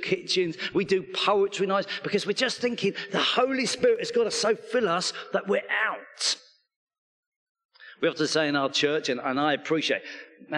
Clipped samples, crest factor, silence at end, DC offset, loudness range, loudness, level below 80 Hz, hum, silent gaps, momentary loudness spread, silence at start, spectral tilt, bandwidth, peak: under 0.1%; 20 dB; 0 s; under 0.1%; 4 LU; -26 LUFS; -72 dBFS; none; 6.76-6.87 s, 6.98-7.55 s, 7.65-7.69 s; 5 LU; 0 s; -3 dB/octave; 11.5 kHz; -8 dBFS